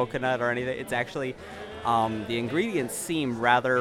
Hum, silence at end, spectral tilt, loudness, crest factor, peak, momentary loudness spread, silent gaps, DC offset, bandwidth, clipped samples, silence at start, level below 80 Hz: none; 0 s; -4.5 dB/octave; -27 LUFS; 20 dB; -6 dBFS; 10 LU; none; under 0.1%; 17 kHz; under 0.1%; 0 s; -56 dBFS